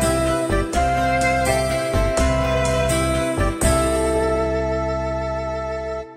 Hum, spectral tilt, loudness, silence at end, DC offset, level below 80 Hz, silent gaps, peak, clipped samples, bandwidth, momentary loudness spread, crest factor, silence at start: none; -5 dB/octave; -20 LUFS; 0 s; under 0.1%; -28 dBFS; none; -4 dBFS; under 0.1%; 16 kHz; 6 LU; 16 dB; 0 s